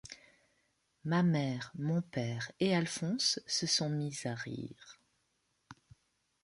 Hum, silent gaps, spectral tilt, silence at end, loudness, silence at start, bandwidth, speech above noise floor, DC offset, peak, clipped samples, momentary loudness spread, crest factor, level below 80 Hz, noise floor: none; none; -4.5 dB/octave; 0.7 s; -34 LUFS; 0.05 s; 11.5 kHz; 45 dB; under 0.1%; -18 dBFS; under 0.1%; 15 LU; 20 dB; -72 dBFS; -79 dBFS